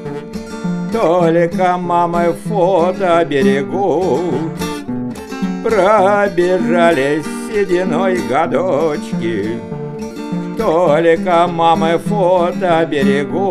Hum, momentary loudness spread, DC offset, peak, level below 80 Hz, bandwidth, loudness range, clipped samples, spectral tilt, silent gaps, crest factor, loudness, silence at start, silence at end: none; 11 LU; under 0.1%; 0 dBFS; -44 dBFS; 14 kHz; 3 LU; under 0.1%; -6.5 dB/octave; none; 14 dB; -15 LUFS; 0 s; 0 s